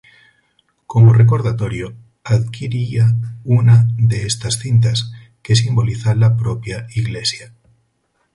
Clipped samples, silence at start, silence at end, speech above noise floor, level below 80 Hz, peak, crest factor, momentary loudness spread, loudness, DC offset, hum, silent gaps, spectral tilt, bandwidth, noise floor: under 0.1%; 0.9 s; 0.9 s; 51 dB; -42 dBFS; 0 dBFS; 14 dB; 13 LU; -16 LUFS; under 0.1%; none; none; -5.5 dB/octave; 11.5 kHz; -65 dBFS